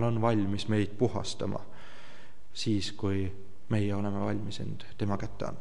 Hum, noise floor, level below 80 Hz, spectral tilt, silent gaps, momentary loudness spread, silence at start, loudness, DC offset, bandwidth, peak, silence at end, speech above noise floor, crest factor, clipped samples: none; -54 dBFS; -58 dBFS; -6.5 dB/octave; none; 21 LU; 0 s; -32 LUFS; 2%; 11 kHz; -14 dBFS; 0 s; 23 dB; 18 dB; under 0.1%